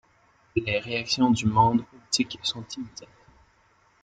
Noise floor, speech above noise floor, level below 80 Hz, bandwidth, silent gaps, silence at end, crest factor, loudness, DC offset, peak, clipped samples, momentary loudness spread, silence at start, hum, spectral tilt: -63 dBFS; 38 dB; -56 dBFS; 9.2 kHz; none; 1 s; 20 dB; -25 LUFS; under 0.1%; -6 dBFS; under 0.1%; 16 LU; 0.55 s; none; -4.5 dB/octave